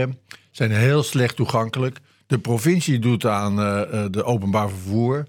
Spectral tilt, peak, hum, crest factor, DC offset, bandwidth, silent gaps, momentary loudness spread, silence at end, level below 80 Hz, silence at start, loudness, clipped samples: -6 dB/octave; -2 dBFS; none; 18 dB; under 0.1%; 17 kHz; none; 7 LU; 0 s; -62 dBFS; 0 s; -21 LUFS; under 0.1%